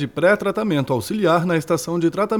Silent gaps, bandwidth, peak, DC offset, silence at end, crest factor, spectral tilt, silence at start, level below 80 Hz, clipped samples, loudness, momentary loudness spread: none; 19 kHz; -4 dBFS; under 0.1%; 0 s; 14 dB; -6 dB/octave; 0 s; -56 dBFS; under 0.1%; -19 LUFS; 4 LU